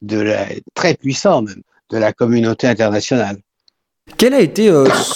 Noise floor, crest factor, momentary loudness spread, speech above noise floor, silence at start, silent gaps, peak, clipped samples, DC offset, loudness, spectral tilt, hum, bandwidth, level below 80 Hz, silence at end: -61 dBFS; 14 dB; 13 LU; 47 dB; 0 s; none; 0 dBFS; under 0.1%; under 0.1%; -15 LUFS; -5 dB/octave; none; 17 kHz; -54 dBFS; 0 s